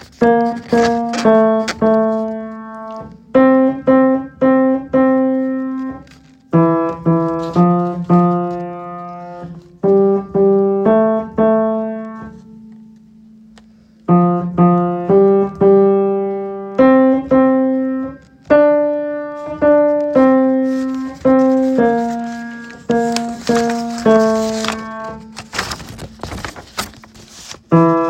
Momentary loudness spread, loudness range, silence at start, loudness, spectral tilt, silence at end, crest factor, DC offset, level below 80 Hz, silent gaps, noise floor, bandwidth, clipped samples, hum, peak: 17 LU; 5 LU; 0 s; -14 LUFS; -7 dB/octave; 0 s; 14 dB; under 0.1%; -48 dBFS; none; -46 dBFS; 15.5 kHz; under 0.1%; none; 0 dBFS